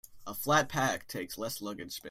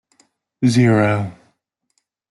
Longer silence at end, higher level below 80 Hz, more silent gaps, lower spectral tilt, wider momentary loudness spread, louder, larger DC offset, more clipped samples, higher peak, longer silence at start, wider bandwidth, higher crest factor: second, 0 s vs 1 s; second, -62 dBFS vs -56 dBFS; neither; second, -3.5 dB/octave vs -7 dB/octave; about the same, 12 LU vs 10 LU; second, -32 LUFS vs -16 LUFS; neither; neither; second, -12 dBFS vs -4 dBFS; second, 0.1 s vs 0.6 s; first, 16 kHz vs 12 kHz; first, 22 dB vs 16 dB